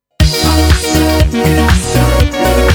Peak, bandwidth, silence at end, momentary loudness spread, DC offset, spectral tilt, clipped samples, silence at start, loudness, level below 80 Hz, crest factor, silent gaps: 0 dBFS; over 20 kHz; 0 s; 2 LU; under 0.1%; -5 dB/octave; 0.2%; 0.2 s; -11 LUFS; -14 dBFS; 10 dB; none